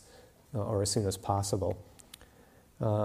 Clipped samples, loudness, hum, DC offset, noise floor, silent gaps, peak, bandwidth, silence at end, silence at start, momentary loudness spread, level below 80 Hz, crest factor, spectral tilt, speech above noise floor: under 0.1%; -33 LUFS; none; under 0.1%; -60 dBFS; none; -14 dBFS; 15.5 kHz; 0 s; 0.15 s; 22 LU; -58 dBFS; 20 dB; -5.5 dB/octave; 28 dB